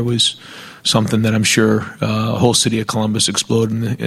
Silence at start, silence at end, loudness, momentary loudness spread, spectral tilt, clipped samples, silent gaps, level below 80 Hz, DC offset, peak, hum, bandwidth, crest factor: 0 s; 0 s; -16 LUFS; 6 LU; -4 dB/octave; under 0.1%; none; -48 dBFS; under 0.1%; 0 dBFS; none; 14.5 kHz; 16 dB